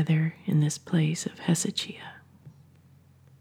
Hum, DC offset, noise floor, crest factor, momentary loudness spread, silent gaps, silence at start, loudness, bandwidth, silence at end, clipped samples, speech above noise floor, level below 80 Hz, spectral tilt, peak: none; under 0.1%; -57 dBFS; 18 dB; 11 LU; none; 0 s; -27 LUFS; 14.5 kHz; 0.9 s; under 0.1%; 30 dB; -74 dBFS; -5 dB/octave; -10 dBFS